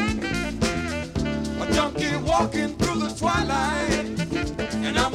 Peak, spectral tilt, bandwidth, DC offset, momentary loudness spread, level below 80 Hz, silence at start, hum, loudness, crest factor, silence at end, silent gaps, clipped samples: -6 dBFS; -4.5 dB/octave; 15.5 kHz; under 0.1%; 5 LU; -38 dBFS; 0 s; none; -25 LUFS; 18 dB; 0 s; none; under 0.1%